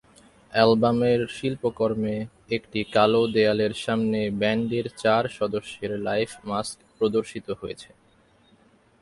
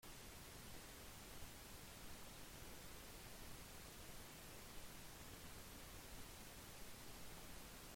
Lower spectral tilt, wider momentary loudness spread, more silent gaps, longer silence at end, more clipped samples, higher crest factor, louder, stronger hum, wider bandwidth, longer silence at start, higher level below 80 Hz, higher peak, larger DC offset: first, -6 dB/octave vs -3 dB/octave; first, 12 LU vs 0 LU; neither; first, 1.2 s vs 0 s; neither; first, 22 dB vs 16 dB; first, -24 LUFS vs -57 LUFS; neither; second, 11.5 kHz vs 16.5 kHz; first, 0.5 s vs 0 s; first, -58 dBFS vs -64 dBFS; first, -4 dBFS vs -40 dBFS; neither